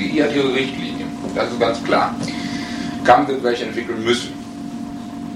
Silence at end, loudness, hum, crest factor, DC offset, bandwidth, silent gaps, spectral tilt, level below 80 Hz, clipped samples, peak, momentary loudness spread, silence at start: 0 s; -20 LUFS; none; 20 dB; under 0.1%; 14 kHz; none; -5 dB/octave; -50 dBFS; under 0.1%; 0 dBFS; 15 LU; 0 s